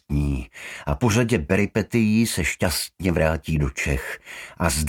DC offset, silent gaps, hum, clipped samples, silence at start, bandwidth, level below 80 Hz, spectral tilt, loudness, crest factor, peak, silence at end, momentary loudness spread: under 0.1%; none; none; under 0.1%; 0.1 s; 18 kHz; -34 dBFS; -5 dB/octave; -23 LUFS; 20 dB; -2 dBFS; 0 s; 12 LU